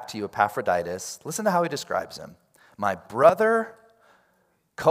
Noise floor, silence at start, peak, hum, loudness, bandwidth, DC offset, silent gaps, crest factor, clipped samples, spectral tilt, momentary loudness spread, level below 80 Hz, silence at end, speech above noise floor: -68 dBFS; 0 s; -4 dBFS; none; -24 LUFS; 16 kHz; under 0.1%; none; 22 dB; under 0.1%; -4.5 dB/octave; 16 LU; -68 dBFS; 0 s; 44 dB